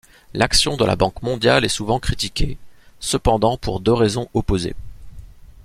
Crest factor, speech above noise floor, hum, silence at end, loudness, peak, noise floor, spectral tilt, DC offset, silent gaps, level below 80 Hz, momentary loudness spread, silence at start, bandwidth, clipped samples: 18 dB; 20 dB; none; 0.05 s; -19 LUFS; -2 dBFS; -39 dBFS; -4.5 dB/octave; under 0.1%; none; -32 dBFS; 12 LU; 0.3 s; 15.5 kHz; under 0.1%